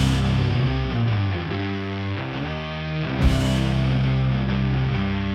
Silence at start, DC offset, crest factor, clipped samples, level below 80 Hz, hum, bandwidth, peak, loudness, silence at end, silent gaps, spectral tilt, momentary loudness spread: 0 s; under 0.1%; 14 dB; under 0.1%; -30 dBFS; none; 11 kHz; -8 dBFS; -23 LUFS; 0 s; none; -7 dB/octave; 7 LU